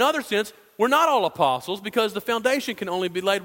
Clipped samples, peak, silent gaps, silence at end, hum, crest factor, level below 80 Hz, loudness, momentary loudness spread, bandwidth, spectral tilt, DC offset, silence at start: under 0.1%; -4 dBFS; none; 0 s; none; 18 dB; -68 dBFS; -23 LUFS; 8 LU; 16.5 kHz; -3.5 dB/octave; under 0.1%; 0 s